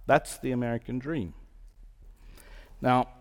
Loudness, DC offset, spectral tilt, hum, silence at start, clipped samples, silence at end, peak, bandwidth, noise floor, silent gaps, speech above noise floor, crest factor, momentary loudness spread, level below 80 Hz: -30 LUFS; under 0.1%; -6 dB/octave; none; 0 s; under 0.1%; 0.1 s; -8 dBFS; 18 kHz; -51 dBFS; none; 23 dB; 22 dB; 9 LU; -50 dBFS